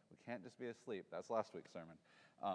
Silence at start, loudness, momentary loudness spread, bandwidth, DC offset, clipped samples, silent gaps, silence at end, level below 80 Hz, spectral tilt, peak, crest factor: 0.1 s; -49 LUFS; 16 LU; 10 kHz; under 0.1%; under 0.1%; none; 0 s; under -90 dBFS; -5.5 dB/octave; -28 dBFS; 22 dB